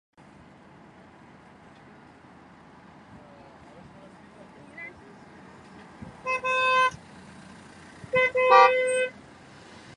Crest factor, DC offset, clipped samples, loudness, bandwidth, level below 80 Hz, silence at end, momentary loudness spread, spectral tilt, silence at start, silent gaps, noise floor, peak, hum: 24 dB; under 0.1%; under 0.1%; -22 LUFS; 11 kHz; -64 dBFS; 0.85 s; 30 LU; -3 dB/octave; 4.75 s; none; -52 dBFS; -4 dBFS; none